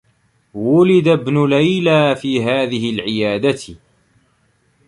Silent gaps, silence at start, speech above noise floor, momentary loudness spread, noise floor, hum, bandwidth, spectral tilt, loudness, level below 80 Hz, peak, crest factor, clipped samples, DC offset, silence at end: none; 0.55 s; 45 dB; 10 LU; -60 dBFS; none; 11.5 kHz; -6.5 dB/octave; -15 LUFS; -54 dBFS; -2 dBFS; 14 dB; under 0.1%; under 0.1%; 1.1 s